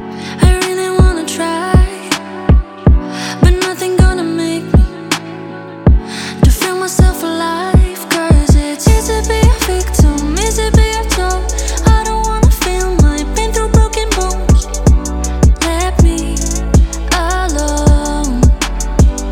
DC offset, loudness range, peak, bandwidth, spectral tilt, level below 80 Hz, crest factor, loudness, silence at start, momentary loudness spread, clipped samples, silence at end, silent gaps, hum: under 0.1%; 2 LU; 0 dBFS; 17 kHz; -5 dB/octave; -14 dBFS; 10 dB; -13 LUFS; 0 s; 5 LU; under 0.1%; 0 s; none; none